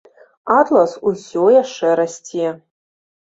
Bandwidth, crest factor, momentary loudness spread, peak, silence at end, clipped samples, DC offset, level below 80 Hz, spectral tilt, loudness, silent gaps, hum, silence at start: 8 kHz; 16 dB; 10 LU; -2 dBFS; 0.7 s; under 0.1%; under 0.1%; -62 dBFS; -5 dB/octave; -16 LUFS; none; none; 0.45 s